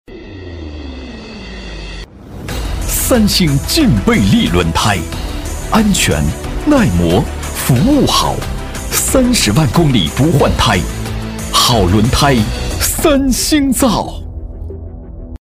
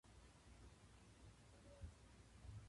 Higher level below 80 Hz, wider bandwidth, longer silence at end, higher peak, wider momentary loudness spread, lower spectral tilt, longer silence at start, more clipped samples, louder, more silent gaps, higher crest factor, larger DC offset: first, -24 dBFS vs -66 dBFS; first, 16 kHz vs 11.5 kHz; about the same, 0.05 s vs 0 s; first, 0 dBFS vs -44 dBFS; first, 18 LU vs 6 LU; about the same, -4.5 dB/octave vs -5 dB/octave; about the same, 0.1 s vs 0.05 s; neither; first, -13 LUFS vs -65 LUFS; neither; about the same, 14 dB vs 18 dB; neither